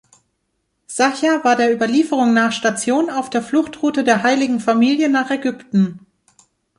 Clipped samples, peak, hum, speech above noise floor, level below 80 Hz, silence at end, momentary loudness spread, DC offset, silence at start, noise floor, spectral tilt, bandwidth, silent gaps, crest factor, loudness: under 0.1%; -2 dBFS; none; 54 dB; -62 dBFS; 0.8 s; 5 LU; under 0.1%; 0.9 s; -70 dBFS; -4.5 dB/octave; 11.5 kHz; none; 16 dB; -17 LUFS